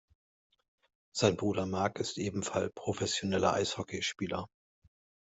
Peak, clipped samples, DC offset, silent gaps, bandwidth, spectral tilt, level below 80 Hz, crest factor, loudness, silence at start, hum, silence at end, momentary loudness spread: -12 dBFS; under 0.1%; under 0.1%; none; 8.2 kHz; -4.5 dB/octave; -66 dBFS; 22 dB; -33 LUFS; 1.15 s; none; 0.75 s; 8 LU